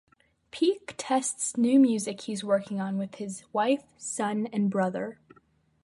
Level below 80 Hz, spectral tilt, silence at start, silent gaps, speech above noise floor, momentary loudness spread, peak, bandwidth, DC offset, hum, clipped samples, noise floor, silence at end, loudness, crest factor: -74 dBFS; -4.5 dB/octave; 0.55 s; none; 37 dB; 13 LU; -12 dBFS; 11.5 kHz; under 0.1%; none; under 0.1%; -64 dBFS; 0.7 s; -28 LUFS; 16 dB